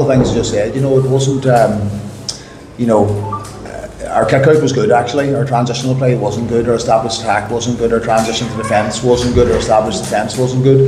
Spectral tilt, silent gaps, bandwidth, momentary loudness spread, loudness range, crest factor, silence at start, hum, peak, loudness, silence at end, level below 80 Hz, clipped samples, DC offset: -6 dB/octave; none; 13 kHz; 12 LU; 2 LU; 14 dB; 0 s; none; 0 dBFS; -14 LUFS; 0 s; -34 dBFS; under 0.1%; under 0.1%